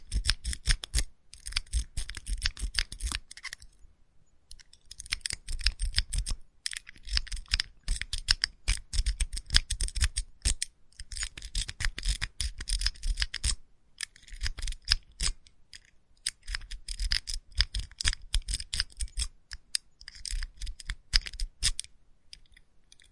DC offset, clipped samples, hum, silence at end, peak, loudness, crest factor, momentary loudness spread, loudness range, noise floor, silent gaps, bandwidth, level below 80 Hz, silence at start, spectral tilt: under 0.1%; under 0.1%; none; 0.3 s; -2 dBFS; -33 LUFS; 30 dB; 13 LU; 5 LU; -59 dBFS; none; 11.5 kHz; -36 dBFS; 0 s; -0.5 dB/octave